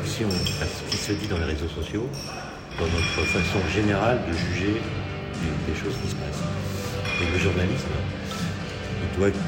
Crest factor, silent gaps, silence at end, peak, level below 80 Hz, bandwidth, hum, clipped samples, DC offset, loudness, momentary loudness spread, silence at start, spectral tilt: 18 dB; none; 0 s; -8 dBFS; -40 dBFS; 16.5 kHz; none; under 0.1%; under 0.1%; -26 LUFS; 8 LU; 0 s; -5 dB/octave